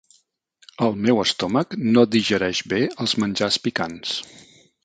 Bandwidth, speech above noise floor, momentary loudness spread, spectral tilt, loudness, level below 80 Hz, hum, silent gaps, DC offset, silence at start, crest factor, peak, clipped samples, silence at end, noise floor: 9.2 kHz; 43 dB; 9 LU; -4.5 dB/octave; -21 LUFS; -56 dBFS; none; none; under 0.1%; 0.8 s; 20 dB; -4 dBFS; under 0.1%; 0.6 s; -64 dBFS